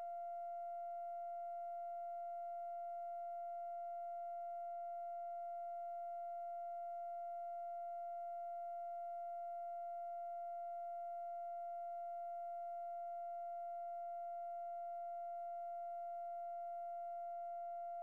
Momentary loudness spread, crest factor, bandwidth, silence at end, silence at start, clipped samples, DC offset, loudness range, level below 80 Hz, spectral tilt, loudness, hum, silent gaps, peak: 0 LU; 4 dB; 2.9 kHz; 0 s; 0 s; under 0.1%; under 0.1%; 0 LU; under -90 dBFS; -3.5 dB/octave; -47 LUFS; none; none; -42 dBFS